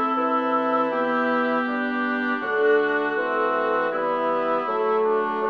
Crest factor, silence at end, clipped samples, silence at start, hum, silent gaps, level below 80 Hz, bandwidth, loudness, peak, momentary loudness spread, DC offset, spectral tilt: 12 dB; 0 s; under 0.1%; 0 s; none; none; -72 dBFS; 6.2 kHz; -22 LUFS; -10 dBFS; 3 LU; under 0.1%; -6.5 dB/octave